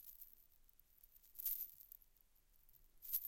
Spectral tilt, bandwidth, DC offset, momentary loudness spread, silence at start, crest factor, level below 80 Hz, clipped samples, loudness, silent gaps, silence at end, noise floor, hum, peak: 1 dB/octave; 17 kHz; under 0.1%; 24 LU; 0 s; 26 dB; -74 dBFS; under 0.1%; -46 LUFS; none; 0 s; -73 dBFS; none; -26 dBFS